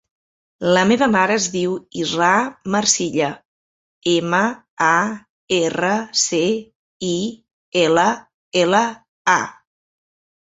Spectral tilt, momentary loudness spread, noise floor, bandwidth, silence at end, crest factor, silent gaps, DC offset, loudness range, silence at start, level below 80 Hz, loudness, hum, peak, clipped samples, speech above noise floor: -3 dB/octave; 10 LU; under -90 dBFS; 8.4 kHz; 0.95 s; 18 dB; 3.45-4.01 s, 4.70-4.77 s, 5.29-5.48 s, 6.75-7.00 s, 7.53-7.72 s, 8.34-8.52 s, 9.08-9.25 s; under 0.1%; 2 LU; 0.6 s; -60 dBFS; -18 LUFS; none; -2 dBFS; under 0.1%; over 72 dB